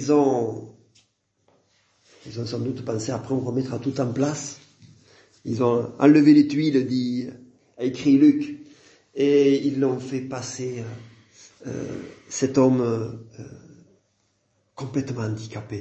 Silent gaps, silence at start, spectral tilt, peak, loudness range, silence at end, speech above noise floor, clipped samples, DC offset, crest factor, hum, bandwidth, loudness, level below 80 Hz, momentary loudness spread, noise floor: none; 0 s; -6.5 dB/octave; -2 dBFS; 9 LU; 0 s; 47 dB; under 0.1%; under 0.1%; 20 dB; none; 8.2 kHz; -22 LUFS; -64 dBFS; 21 LU; -69 dBFS